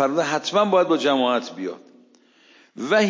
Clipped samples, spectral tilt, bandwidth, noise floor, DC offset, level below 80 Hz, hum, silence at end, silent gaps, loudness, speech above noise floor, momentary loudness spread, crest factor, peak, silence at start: under 0.1%; -4.5 dB/octave; 7.6 kHz; -55 dBFS; under 0.1%; -78 dBFS; none; 0 s; none; -21 LUFS; 35 dB; 15 LU; 16 dB; -6 dBFS; 0 s